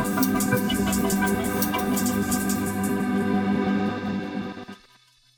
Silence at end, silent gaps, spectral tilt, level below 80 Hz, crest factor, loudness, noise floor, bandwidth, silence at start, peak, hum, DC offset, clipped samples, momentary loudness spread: 0.6 s; none; -5 dB/octave; -46 dBFS; 16 dB; -24 LUFS; -58 dBFS; over 20 kHz; 0 s; -8 dBFS; none; under 0.1%; under 0.1%; 8 LU